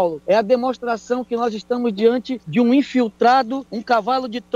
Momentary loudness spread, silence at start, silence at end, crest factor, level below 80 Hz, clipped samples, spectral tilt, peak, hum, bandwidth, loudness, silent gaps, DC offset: 7 LU; 0 s; 0.15 s; 14 dB; -60 dBFS; under 0.1%; -6 dB/octave; -4 dBFS; none; 7.6 kHz; -19 LUFS; none; under 0.1%